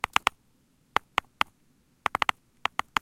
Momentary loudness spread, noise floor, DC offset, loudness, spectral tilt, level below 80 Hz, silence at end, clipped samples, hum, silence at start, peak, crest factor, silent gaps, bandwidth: 5 LU; -66 dBFS; under 0.1%; -30 LUFS; -1.5 dB/octave; -64 dBFS; 2.7 s; under 0.1%; none; 0.25 s; 0 dBFS; 30 dB; none; 16.5 kHz